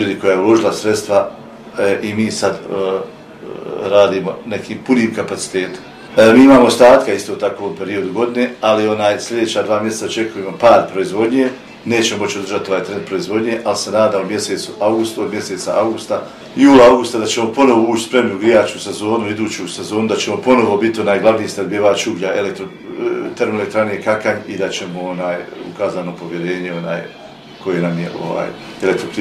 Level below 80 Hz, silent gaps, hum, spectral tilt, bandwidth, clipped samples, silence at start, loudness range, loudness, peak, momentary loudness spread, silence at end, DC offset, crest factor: -52 dBFS; none; none; -4.5 dB/octave; 14.5 kHz; under 0.1%; 0 s; 8 LU; -15 LUFS; 0 dBFS; 13 LU; 0 s; under 0.1%; 14 dB